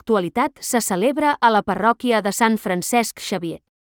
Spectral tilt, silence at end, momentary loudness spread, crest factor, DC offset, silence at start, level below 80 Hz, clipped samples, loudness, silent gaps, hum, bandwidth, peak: -4 dB/octave; 0.25 s; 8 LU; 16 dB; under 0.1%; 0.05 s; -58 dBFS; under 0.1%; -19 LUFS; none; none; 20 kHz; -4 dBFS